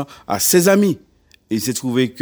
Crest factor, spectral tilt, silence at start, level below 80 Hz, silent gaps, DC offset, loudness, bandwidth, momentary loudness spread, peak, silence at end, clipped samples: 18 dB; -4 dB/octave; 0 s; -56 dBFS; none; under 0.1%; -17 LUFS; over 20 kHz; 12 LU; 0 dBFS; 0 s; under 0.1%